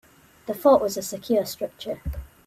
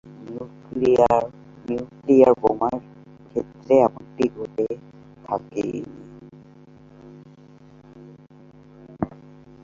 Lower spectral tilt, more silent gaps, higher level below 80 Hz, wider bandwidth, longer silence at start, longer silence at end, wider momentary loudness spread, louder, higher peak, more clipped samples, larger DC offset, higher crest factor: second, -5 dB/octave vs -8 dB/octave; neither; first, -42 dBFS vs -56 dBFS; first, 16 kHz vs 7.6 kHz; first, 0.45 s vs 0.05 s; second, 0.2 s vs 0.55 s; second, 16 LU vs 19 LU; about the same, -24 LUFS vs -22 LUFS; about the same, -4 dBFS vs -2 dBFS; neither; neither; about the same, 20 dB vs 22 dB